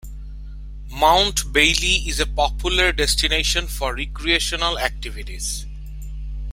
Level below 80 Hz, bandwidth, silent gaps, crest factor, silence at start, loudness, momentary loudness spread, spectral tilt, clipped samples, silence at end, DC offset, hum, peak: -28 dBFS; 16.5 kHz; none; 20 dB; 0.05 s; -19 LUFS; 21 LU; -2 dB/octave; under 0.1%; 0 s; under 0.1%; none; -2 dBFS